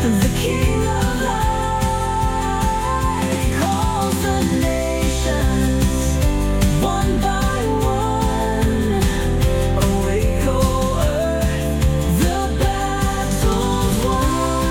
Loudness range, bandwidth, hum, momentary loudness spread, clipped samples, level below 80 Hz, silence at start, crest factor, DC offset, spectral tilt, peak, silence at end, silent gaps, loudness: 1 LU; 17.5 kHz; none; 2 LU; under 0.1%; -22 dBFS; 0 s; 14 dB; under 0.1%; -5.5 dB/octave; -4 dBFS; 0 s; none; -19 LUFS